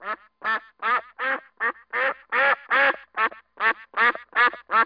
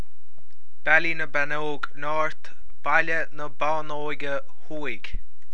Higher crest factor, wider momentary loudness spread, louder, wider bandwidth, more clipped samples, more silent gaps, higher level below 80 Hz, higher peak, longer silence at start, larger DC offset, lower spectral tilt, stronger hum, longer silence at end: second, 16 dB vs 22 dB; second, 7 LU vs 15 LU; first, -23 LUFS vs -26 LUFS; second, 5.2 kHz vs 10 kHz; neither; neither; second, -68 dBFS vs -44 dBFS; second, -8 dBFS vs -4 dBFS; second, 0 s vs 0.85 s; second, under 0.1% vs 10%; second, -3.5 dB/octave vs -5 dB/octave; neither; second, 0 s vs 0.3 s